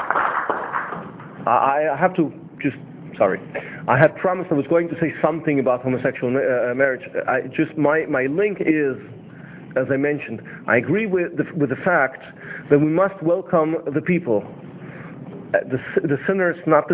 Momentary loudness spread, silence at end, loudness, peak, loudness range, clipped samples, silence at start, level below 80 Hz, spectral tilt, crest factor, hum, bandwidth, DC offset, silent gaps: 17 LU; 0 s; -21 LUFS; 0 dBFS; 2 LU; under 0.1%; 0 s; -60 dBFS; -11 dB/octave; 20 dB; none; 4 kHz; under 0.1%; none